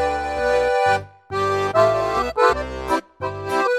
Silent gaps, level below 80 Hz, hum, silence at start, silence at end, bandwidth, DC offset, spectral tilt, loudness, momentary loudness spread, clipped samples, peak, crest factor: none; -42 dBFS; none; 0 s; 0 s; 15 kHz; under 0.1%; -5 dB/octave; -20 LUFS; 8 LU; under 0.1%; -4 dBFS; 16 dB